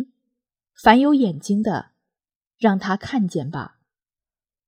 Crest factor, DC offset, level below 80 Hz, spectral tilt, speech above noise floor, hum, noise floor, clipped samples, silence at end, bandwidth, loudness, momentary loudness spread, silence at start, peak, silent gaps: 22 dB; under 0.1%; -54 dBFS; -6.5 dB/octave; over 71 dB; none; under -90 dBFS; under 0.1%; 1 s; 15 kHz; -20 LUFS; 17 LU; 0 s; 0 dBFS; 2.36-2.41 s